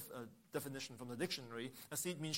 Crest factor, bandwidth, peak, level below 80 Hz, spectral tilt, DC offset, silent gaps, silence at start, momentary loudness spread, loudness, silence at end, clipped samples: 20 dB; 16.5 kHz; -26 dBFS; -80 dBFS; -3.5 dB/octave; under 0.1%; none; 0 s; 6 LU; -45 LUFS; 0 s; under 0.1%